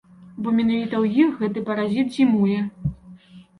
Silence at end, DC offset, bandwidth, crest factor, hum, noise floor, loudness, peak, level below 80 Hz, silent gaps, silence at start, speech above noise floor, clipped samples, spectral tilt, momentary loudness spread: 0.2 s; under 0.1%; 10.5 kHz; 16 dB; none; -46 dBFS; -22 LUFS; -6 dBFS; -50 dBFS; none; 0.2 s; 26 dB; under 0.1%; -8 dB/octave; 10 LU